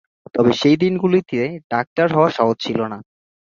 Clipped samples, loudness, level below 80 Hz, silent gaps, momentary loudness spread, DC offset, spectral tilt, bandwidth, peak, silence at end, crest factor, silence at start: under 0.1%; -18 LUFS; -58 dBFS; 1.64-1.70 s, 1.87-1.96 s; 9 LU; under 0.1%; -6.5 dB/octave; 7.2 kHz; -2 dBFS; 0.4 s; 18 dB; 0.35 s